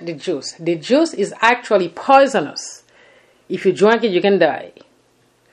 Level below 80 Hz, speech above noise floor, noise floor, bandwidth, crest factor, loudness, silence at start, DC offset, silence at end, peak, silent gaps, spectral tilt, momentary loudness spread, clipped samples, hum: -62 dBFS; 41 dB; -58 dBFS; 11 kHz; 18 dB; -16 LUFS; 0 s; under 0.1%; 0.85 s; 0 dBFS; none; -4.5 dB/octave; 14 LU; under 0.1%; none